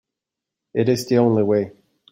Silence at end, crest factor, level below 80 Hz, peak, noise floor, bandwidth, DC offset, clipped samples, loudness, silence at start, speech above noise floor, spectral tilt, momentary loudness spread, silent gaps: 0.4 s; 16 dB; -60 dBFS; -4 dBFS; -85 dBFS; 16.5 kHz; under 0.1%; under 0.1%; -19 LUFS; 0.75 s; 67 dB; -7 dB/octave; 10 LU; none